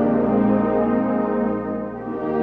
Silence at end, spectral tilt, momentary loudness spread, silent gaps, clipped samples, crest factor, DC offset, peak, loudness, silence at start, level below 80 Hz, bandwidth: 0 s; -11 dB/octave; 9 LU; none; under 0.1%; 14 dB; under 0.1%; -8 dBFS; -21 LUFS; 0 s; -46 dBFS; 3.9 kHz